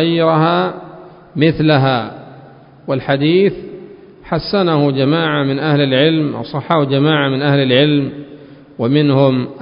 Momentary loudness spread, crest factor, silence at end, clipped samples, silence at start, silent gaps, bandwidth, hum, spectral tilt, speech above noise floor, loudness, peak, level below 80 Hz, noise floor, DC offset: 15 LU; 14 dB; 0 s; under 0.1%; 0 s; none; 5.4 kHz; none; -10.5 dB/octave; 26 dB; -14 LUFS; 0 dBFS; -50 dBFS; -40 dBFS; under 0.1%